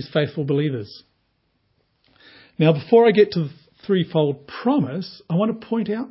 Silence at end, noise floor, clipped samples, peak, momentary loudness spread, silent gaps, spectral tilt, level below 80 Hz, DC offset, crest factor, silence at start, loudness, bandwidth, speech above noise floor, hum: 0 s; -68 dBFS; under 0.1%; -2 dBFS; 16 LU; none; -11.5 dB/octave; -64 dBFS; under 0.1%; 18 dB; 0 s; -20 LUFS; 5.8 kHz; 48 dB; none